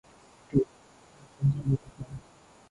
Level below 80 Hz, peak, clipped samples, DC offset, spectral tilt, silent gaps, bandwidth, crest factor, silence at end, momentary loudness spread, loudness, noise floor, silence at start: -54 dBFS; -10 dBFS; under 0.1%; under 0.1%; -9.5 dB/octave; none; 10.5 kHz; 22 dB; 0.5 s; 16 LU; -30 LUFS; -57 dBFS; 0.5 s